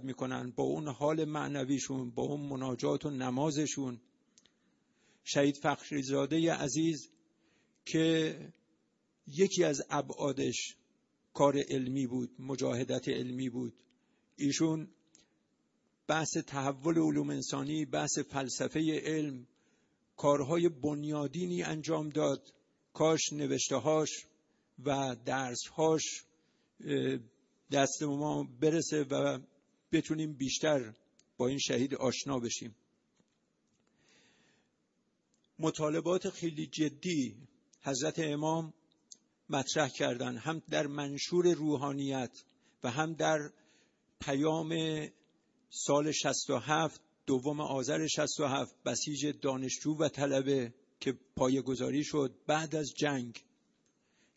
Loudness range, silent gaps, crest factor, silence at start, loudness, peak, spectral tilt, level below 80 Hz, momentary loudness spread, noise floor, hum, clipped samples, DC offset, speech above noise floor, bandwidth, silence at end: 3 LU; none; 22 dB; 0 s; -34 LUFS; -12 dBFS; -4.5 dB/octave; -72 dBFS; 9 LU; -78 dBFS; none; under 0.1%; under 0.1%; 45 dB; 8 kHz; 0.95 s